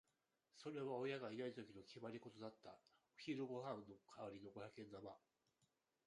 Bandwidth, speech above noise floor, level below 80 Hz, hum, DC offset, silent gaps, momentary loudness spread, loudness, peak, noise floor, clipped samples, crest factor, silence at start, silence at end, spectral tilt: 11 kHz; 36 dB; -88 dBFS; none; under 0.1%; none; 13 LU; -53 LUFS; -34 dBFS; -88 dBFS; under 0.1%; 18 dB; 0.55 s; 0.9 s; -6 dB/octave